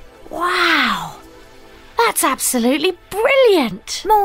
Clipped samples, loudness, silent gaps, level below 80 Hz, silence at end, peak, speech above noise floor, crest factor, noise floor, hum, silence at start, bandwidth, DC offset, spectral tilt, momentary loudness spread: under 0.1%; -16 LUFS; none; -46 dBFS; 0 s; -2 dBFS; 26 dB; 16 dB; -41 dBFS; none; 0 s; 16.5 kHz; under 0.1%; -2 dB/octave; 12 LU